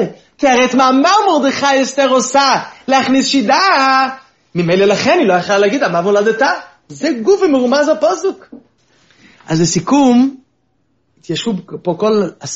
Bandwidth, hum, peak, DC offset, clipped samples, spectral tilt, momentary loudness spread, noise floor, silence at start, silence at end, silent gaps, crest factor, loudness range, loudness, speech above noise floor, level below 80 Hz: 8 kHz; none; 0 dBFS; under 0.1%; under 0.1%; -3.5 dB/octave; 10 LU; -62 dBFS; 0 s; 0 s; none; 14 dB; 5 LU; -13 LUFS; 50 dB; -56 dBFS